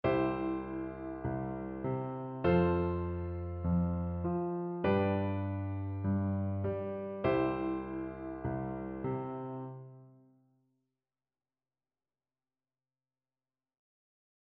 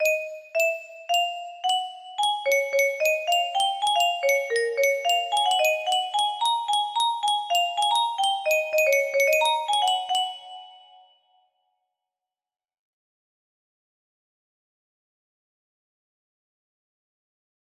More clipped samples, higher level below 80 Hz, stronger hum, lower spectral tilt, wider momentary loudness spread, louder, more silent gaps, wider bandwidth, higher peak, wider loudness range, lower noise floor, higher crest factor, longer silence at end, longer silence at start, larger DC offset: neither; first, -54 dBFS vs -80 dBFS; neither; first, -8 dB/octave vs 3 dB/octave; first, 10 LU vs 6 LU; second, -35 LUFS vs -23 LUFS; neither; second, 5.2 kHz vs 16 kHz; second, -18 dBFS vs -10 dBFS; first, 10 LU vs 4 LU; about the same, under -90 dBFS vs -89 dBFS; about the same, 18 dB vs 16 dB; second, 4.45 s vs 7.05 s; about the same, 0.05 s vs 0 s; neither